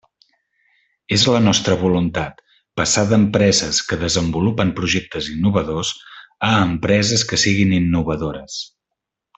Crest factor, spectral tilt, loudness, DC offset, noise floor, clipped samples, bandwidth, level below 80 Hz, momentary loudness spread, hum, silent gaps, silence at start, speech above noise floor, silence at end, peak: 16 dB; -4 dB/octave; -17 LUFS; under 0.1%; -81 dBFS; under 0.1%; 8.4 kHz; -44 dBFS; 11 LU; none; none; 1.1 s; 64 dB; 0.7 s; -2 dBFS